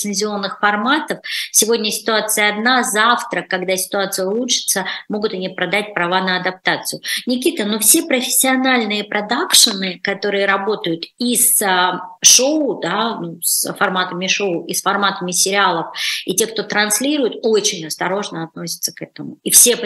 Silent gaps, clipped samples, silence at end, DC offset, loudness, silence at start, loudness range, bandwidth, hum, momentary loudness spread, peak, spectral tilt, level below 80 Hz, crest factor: none; under 0.1%; 0 s; under 0.1%; -16 LUFS; 0 s; 4 LU; 16 kHz; none; 11 LU; 0 dBFS; -1.5 dB/octave; -70 dBFS; 18 dB